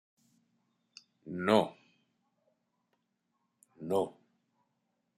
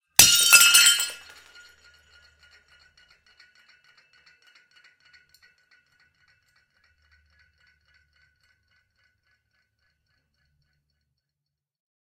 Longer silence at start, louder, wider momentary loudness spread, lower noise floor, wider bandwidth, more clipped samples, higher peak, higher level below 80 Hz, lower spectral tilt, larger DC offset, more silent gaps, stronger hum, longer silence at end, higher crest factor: first, 1.25 s vs 0.2 s; second, -32 LUFS vs -14 LUFS; about the same, 18 LU vs 18 LU; second, -81 dBFS vs -86 dBFS; about the same, 15 kHz vs 16 kHz; neither; second, -12 dBFS vs 0 dBFS; second, -80 dBFS vs -62 dBFS; first, -6 dB/octave vs 2 dB/octave; neither; neither; neither; second, 1.05 s vs 10.9 s; about the same, 26 dB vs 28 dB